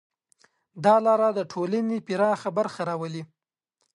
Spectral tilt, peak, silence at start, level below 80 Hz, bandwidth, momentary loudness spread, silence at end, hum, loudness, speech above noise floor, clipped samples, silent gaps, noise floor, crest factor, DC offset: -6.5 dB/octave; -6 dBFS; 0.75 s; -76 dBFS; 11 kHz; 11 LU; 0.75 s; none; -24 LUFS; 55 dB; under 0.1%; none; -79 dBFS; 20 dB; under 0.1%